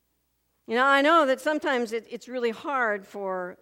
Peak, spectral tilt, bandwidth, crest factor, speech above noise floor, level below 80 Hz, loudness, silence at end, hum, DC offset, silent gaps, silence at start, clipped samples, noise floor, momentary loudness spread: -6 dBFS; -3.5 dB/octave; 16.5 kHz; 18 dB; 48 dB; -76 dBFS; -25 LUFS; 0.1 s; none; under 0.1%; none; 0.7 s; under 0.1%; -73 dBFS; 13 LU